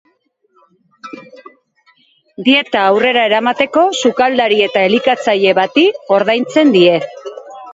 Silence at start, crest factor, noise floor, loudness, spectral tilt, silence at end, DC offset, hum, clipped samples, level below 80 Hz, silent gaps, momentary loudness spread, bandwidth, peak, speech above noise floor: 1.05 s; 14 dB; -60 dBFS; -12 LUFS; -4.5 dB/octave; 0 s; under 0.1%; none; under 0.1%; -60 dBFS; none; 19 LU; 8 kHz; 0 dBFS; 48 dB